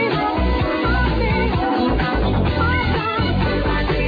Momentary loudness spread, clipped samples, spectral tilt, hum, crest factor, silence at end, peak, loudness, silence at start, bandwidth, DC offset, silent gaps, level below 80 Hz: 1 LU; under 0.1%; -8.5 dB/octave; none; 12 dB; 0 s; -6 dBFS; -19 LUFS; 0 s; 5 kHz; under 0.1%; none; -24 dBFS